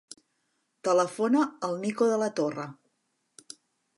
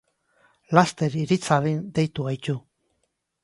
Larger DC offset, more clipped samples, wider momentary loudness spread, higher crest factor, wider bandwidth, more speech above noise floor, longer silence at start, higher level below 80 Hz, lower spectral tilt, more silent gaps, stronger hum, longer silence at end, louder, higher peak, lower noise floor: neither; neither; first, 22 LU vs 9 LU; second, 18 dB vs 24 dB; about the same, 11.5 kHz vs 11.5 kHz; about the same, 50 dB vs 52 dB; first, 0.85 s vs 0.7 s; second, -84 dBFS vs -60 dBFS; about the same, -5 dB/octave vs -6 dB/octave; neither; neither; first, 1.25 s vs 0.85 s; second, -27 LUFS vs -24 LUFS; second, -12 dBFS vs -2 dBFS; about the same, -77 dBFS vs -75 dBFS